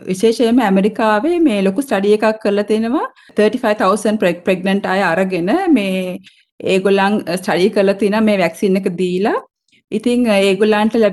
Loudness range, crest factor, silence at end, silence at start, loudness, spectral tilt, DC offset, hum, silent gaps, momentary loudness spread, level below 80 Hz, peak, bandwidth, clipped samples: 1 LU; 12 dB; 0 s; 0 s; -15 LUFS; -6 dB/octave; under 0.1%; none; 6.52-6.58 s; 6 LU; -56 dBFS; -2 dBFS; 12.5 kHz; under 0.1%